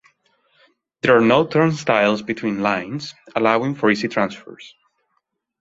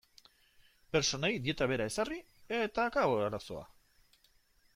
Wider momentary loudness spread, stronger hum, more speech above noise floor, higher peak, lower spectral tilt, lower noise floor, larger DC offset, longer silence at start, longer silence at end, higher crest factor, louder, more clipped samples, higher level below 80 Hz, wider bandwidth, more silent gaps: about the same, 13 LU vs 12 LU; neither; first, 53 dB vs 36 dB; first, 0 dBFS vs -18 dBFS; first, -6 dB/octave vs -4 dB/octave; about the same, -72 dBFS vs -69 dBFS; neither; about the same, 1.05 s vs 0.95 s; second, 0.95 s vs 1.1 s; about the same, 20 dB vs 18 dB; first, -19 LUFS vs -33 LUFS; neither; about the same, -60 dBFS vs -60 dBFS; second, 8 kHz vs 16 kHz; neither